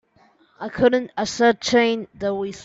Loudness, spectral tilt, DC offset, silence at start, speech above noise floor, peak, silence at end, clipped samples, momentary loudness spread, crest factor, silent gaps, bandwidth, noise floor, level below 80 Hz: -20 LUFS; -4 dB/octave; under 0.1%; 0.6 s; 37 dB; -6 dBFS; 0 s; under 0.1%; 9 LU; 16 dB; none; 8 kHz; -58 dBFS; -54 dBFS